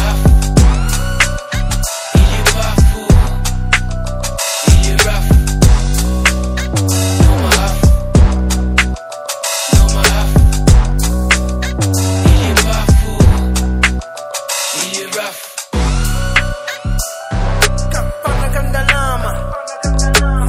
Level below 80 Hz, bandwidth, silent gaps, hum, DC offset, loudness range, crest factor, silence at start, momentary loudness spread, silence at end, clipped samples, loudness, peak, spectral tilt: -14 dBFS; 16.5 kHz; none; none; under 0.1%; 4 LU; 12 dB; 0 s; 9 LU; 0 s; 0.5%; -14 LUFS; 0 dBFS; -4.5 dB/octave